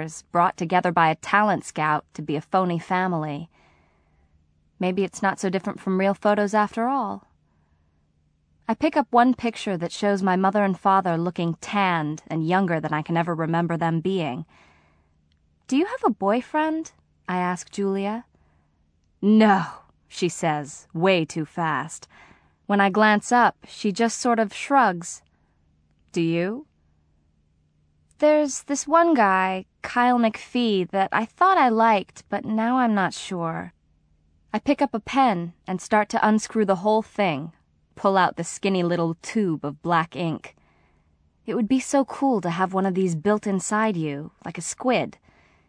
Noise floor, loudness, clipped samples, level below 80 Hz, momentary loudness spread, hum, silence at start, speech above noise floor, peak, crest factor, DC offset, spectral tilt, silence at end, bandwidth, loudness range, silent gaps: -65 dBFS; -23 LUFS; under 0.1%; -64 dBFS; 12 LU; none; 0 s; 43 dB; -4 dBFS; 20 dB; under 0.1%; -5.5 dB/octave; 0.6 s; 10.5 kHz; 5 LU; none